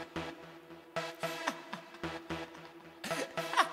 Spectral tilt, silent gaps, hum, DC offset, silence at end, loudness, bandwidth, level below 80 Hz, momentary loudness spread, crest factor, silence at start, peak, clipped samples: -3 dB/octave; none; none; under 0.1%; 0 s; -39 LUFS; 16 kHz; -66 dBFS; 16 LU; 28 dB; 0 s; -12 dBFS; under 0.1%